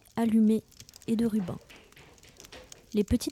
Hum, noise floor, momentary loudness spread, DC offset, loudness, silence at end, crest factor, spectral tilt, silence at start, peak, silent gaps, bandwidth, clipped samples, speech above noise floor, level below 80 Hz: none; -55 dBFS; 24 LU; under 0.1%; -28 LUFS; 0 s; 14 dB; -6.5 dB/octave; 0.15 s; -16 dBFS; none; 15 kHz; under 0.1%; 28 dB; -48 dBFS